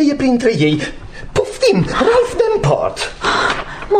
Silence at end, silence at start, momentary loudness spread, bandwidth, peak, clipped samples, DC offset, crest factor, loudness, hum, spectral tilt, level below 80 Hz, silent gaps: 0 s; 0 s; 7 LU; 14 kHz; -2 dBFS; under 0.1%; 0.3%; 14 dB; -15 LUFS; none; -5.5 dB/octave; -34 dBFS; none